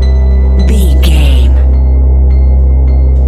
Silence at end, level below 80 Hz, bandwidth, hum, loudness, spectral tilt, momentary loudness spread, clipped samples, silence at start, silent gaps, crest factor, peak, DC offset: 0 s; -6 dBFS; 12 kHz; none; -9 LUFS; -7 dB/octave; 1 LU; 0.3%; 0 s; none; 6 dB; 0 dBFS; under 0.1%